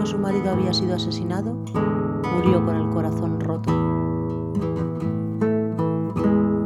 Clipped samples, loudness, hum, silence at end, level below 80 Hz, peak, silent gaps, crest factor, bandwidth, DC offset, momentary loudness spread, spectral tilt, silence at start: under 0.1%; -23 LUFS; none; 0 s; -48 dBFS; -4 dBFS; none; 18 dB; 12 kHz; under 0.1%; 6 LU; -7.5 dB/octave; 0 s